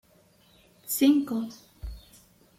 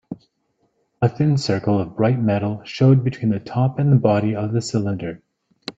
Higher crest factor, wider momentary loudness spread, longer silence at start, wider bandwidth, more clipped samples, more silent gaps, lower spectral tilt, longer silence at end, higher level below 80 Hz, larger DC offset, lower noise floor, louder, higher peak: about the same, 18 dB vs 18 dB; first, 24 LU vs 11 LU; first, 0.85 s vs 0.1 s; first, 16 kHz vs 7.8 kHz; neither; neither; second, -4 dB/octave vs -7.5 dB/octave; first, 0.6 s vs 0.05 s; about the same, -50 dBFS vs -54 dBFS; neither; second, -61 dBFS vs -68 dBFS; second, -25 LUFS vs -20 LUFS; second, -12 dBFS vs -2 dBFS